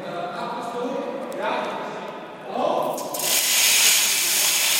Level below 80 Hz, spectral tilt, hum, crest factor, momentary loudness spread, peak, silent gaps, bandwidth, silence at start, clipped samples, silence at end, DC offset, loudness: -76 dBFS; 0 dB/octave; none; 18 dB; 17 LU; -4 dBFS; none; 17 kHz; 0 s; under 0.1%; 0 s; under 0.1%; -20 LUFS